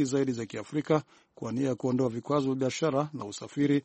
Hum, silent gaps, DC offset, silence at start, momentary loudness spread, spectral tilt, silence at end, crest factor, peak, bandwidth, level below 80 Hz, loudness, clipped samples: none; none; under 0.1%; 0 s; 8 LU; -6.5 dB/octave; 0.05 s; 18 dB; -10 dBFS; 8.4 kHz; -68 dBFS; -30 LUFS; under 0.1%